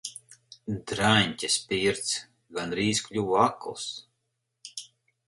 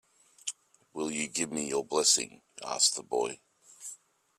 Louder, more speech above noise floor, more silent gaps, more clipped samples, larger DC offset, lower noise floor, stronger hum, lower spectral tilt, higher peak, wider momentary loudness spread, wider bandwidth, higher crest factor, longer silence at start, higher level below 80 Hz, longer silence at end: about the same, -27 LUFS vs -29 LUFS; first, 53 dB vs 21 dB; neither; neither; neither; first, -80 dBFS vs -52 dBFS; neither; first, -3.5 dB/octave vs -1 dB/octave; first, -6 dBFS vs -10 dBFS; about the same, 19 LU vs 20 LU; second, 11.5 kHz vs 15.5 kHz; about the same, 24 dB vs 24 dB; second, 0.05 s vs 0.45 s; first, -58 dBFS vs -76 dBFS; about the same, 0.45 s vs 0.45 s